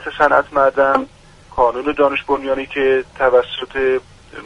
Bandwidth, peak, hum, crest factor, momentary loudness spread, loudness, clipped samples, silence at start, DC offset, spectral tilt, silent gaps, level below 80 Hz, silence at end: 10 kHz; 0 dBFS; none; 16 dB; 8 LU; -16 LUFS; under 0.1%; 0 s; under 0.1%; -5.5 dB/octave; none; -44 dBFS; 0 s